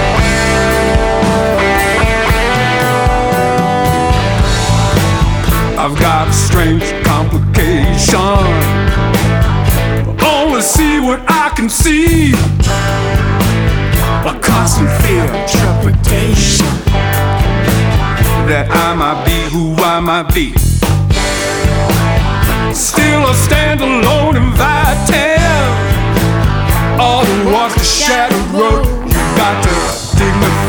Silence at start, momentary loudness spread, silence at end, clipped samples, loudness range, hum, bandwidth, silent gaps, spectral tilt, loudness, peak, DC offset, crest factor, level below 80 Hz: 0 s; 3 LU; 0 s; under 0.1%; 1 LU; none; over 20 kHz; none; -5 dB/octave; -11 LUFS; 0 dBFS; under 0.1%; 10 dB; -18 dBFS